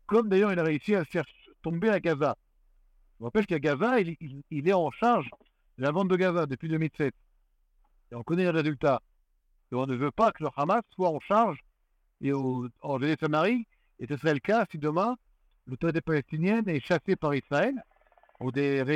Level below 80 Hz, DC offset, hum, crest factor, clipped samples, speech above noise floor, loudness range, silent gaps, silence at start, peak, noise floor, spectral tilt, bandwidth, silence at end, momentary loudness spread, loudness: -62 dBFS; under 0.1%; none; 18 dB; under 0.1%; 44 dB; 2 LU; none; 0.1 s; -10 dBFS; -71 dBFS; -7.5 dB/octave; 11 kHz; 0 s; 12 LU; -28 LUFS